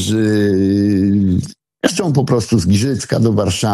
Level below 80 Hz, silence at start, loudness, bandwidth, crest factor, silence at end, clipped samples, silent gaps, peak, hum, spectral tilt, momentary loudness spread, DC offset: -42 dBFS; 0 s; -15 LUFS; 14 kHz; 14 dB; 0 s; under 0.1%; none; 0 dBFS; none; -6 dB/octave; 4 LU; under 0.1%